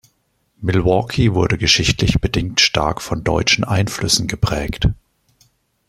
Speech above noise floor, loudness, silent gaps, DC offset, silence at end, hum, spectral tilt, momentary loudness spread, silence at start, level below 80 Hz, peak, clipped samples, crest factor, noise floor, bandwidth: 48 dB; -17 LUFS; none; under 0.1%; 0.95 s; none; -4 dB/octave; 7 LU; 0.6 s; -32 dBFS; 0 dBFS; under 0.1%; 18 dB; -64 dBFS; 15 kHz